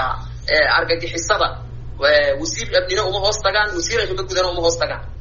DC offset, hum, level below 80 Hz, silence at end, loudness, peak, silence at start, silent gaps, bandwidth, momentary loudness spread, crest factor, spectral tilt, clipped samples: under 0.1%; none; -34 dBFS; 0 s; -18 LUFS; -2 dBFS; 0 s; none; 7.4 kHz; 8 LU; 18 dB; -1.5 dB/octave; under 0.1%